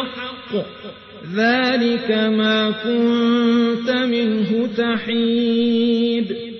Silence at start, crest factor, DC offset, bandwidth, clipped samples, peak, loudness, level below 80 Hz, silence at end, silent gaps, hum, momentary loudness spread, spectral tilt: 0 s; 12 dB; under 0.1%; 6.2 kHz; under 0.1%; -6 dBFS; -18 LUFS; -62 dBFS; 0 s; none; none; 10 LU; -6.5 dB/octave